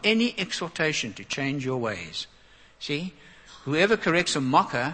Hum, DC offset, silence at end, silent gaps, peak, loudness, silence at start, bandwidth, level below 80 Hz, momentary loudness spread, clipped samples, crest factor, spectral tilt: none; under 0.1%; 0 s; none; -6 dBFS; -26 LUFS; 0 s; 8.8 kHz; -60 dBFS; 13 LU; under 0.1%; 20 dB; -4 dB/octave